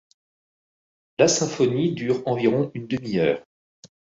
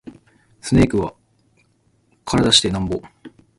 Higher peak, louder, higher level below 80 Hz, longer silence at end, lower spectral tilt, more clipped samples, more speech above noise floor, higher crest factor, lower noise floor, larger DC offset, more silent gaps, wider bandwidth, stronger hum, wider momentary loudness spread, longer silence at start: second, -4 dBFS vs 0 dBFS; second, -23 LUFS vs -18 LUFS; second, -62 dBFS vs -38 dBFS; about the same, 0.3 s vs 0.3 s; about the same, -5 dB/octave vs -4.5 dB/octave; neither; first, over 68 dB vs 44 dB; about the same, 20 dB vs 22 dB; first, under -90 dBFS vs -61 dBFS; neither; first, 3.46-3.83 s vs none; second, 8 kHz vs 11.5 kHz; neither; second, 9 LU vs 17 LU; first, 1.2 s vs 0.05 s